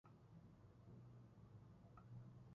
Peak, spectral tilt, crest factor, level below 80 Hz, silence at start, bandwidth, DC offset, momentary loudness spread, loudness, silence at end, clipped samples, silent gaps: -48 dBFS; -9 dB/octave; 14 dB; -76 dBFS; 0.05 s; 6.8 kHz; under 0.1%; 5 LU; -64 LUFS; 0 s; under 0.1%; none